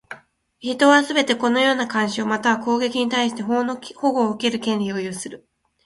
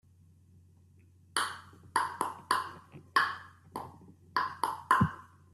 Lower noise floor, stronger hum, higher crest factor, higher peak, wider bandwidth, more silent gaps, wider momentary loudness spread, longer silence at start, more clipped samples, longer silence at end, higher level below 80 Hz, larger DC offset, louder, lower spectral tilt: second, -42 dBFS vs -61 dBFS; neither; second, 20 dB vs 26 dB; first, 0 dBFS vs -10 dBFS; second, 11.5 kHz vs 15 kHz; neither; second, 14 LU vs 18 LU; second, 0.1 s vs 1.35 s; neither; first, 0.5 s vs 0.3 s; about the same, -64 dBFS vs -66 dBFS; neither; first, -20 LUFS vs -32 LUFS; about the same, -4 dB/octave vs -3.5 dB/octave